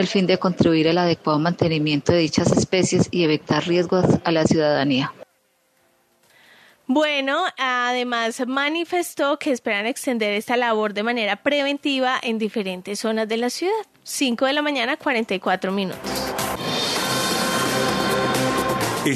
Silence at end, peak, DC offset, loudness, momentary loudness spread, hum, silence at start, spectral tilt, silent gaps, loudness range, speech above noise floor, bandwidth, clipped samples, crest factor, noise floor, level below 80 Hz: 0 s; -4 dBFS; under 0.1%; -21 LUFS; 6 LU; none; 0 s; -4.5 dB/octave; none; 4 LU; 44 dB; 14 kHz; under 0.1%; 18 dB; -64 dBFS; -54 dBFS